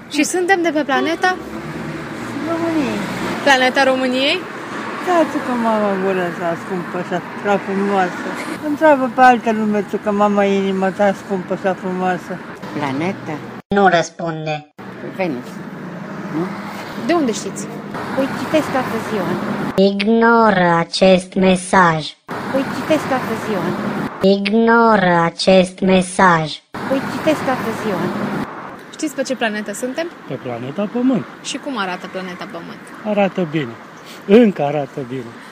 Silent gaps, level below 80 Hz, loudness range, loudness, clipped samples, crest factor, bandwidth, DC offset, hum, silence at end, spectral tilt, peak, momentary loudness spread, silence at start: 13.65-13.70 s; -52 dBFS; 8 LU; -17 LUFS; under 0.1%; 18 dB; 15.5 kHz; under 0.1%; none; 0 s; -5 dB/octave; 0 dBFS; 15 LU; 0 s